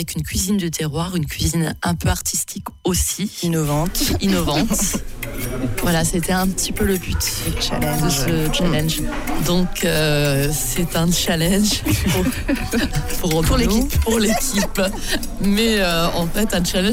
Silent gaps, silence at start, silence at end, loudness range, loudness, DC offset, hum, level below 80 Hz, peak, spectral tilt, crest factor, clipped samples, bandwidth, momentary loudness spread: none; 0 s; 0 s; 2 LU; -19 LUFS; under 0.1%; none; -28 dBFS; -6 dBFS; -4 dB/octave; 12 dB; under 0.1%; 16.5 kHz; 5 LU